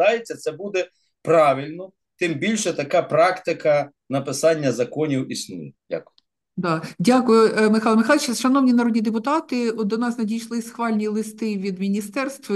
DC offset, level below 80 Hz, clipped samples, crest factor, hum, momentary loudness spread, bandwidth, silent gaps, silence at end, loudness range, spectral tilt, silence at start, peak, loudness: under 0.1%; -70 dBFS; under 0.1%; 16 dB; none; 13 LU; 12.5 kHz; none; 0 s; 5 LU; -5 dB/octave; 0 s; -4 dBFS; -21 LUFS